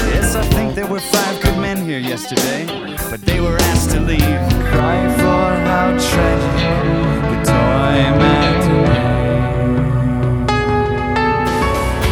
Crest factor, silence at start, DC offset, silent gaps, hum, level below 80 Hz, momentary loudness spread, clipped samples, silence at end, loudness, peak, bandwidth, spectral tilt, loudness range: 14 dB; 0 s; 0.1%; none; none; -24 dBFS; 6 LU; under 0.1%; 0 s; -15 LUFS; 0 dBFS; over 20 kHz; -5.5 dB/octave; 3 LU